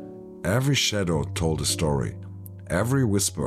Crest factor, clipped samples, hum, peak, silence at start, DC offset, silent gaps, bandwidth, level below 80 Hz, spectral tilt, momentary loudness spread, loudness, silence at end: 14 dB; under 0.1%; none; -12 dBFS; 0 s; under 0.1%; none; 15.5 kHz; -42 dBFS; -4.5 dB/octave; 18 LU; -24 LUFS; 0 s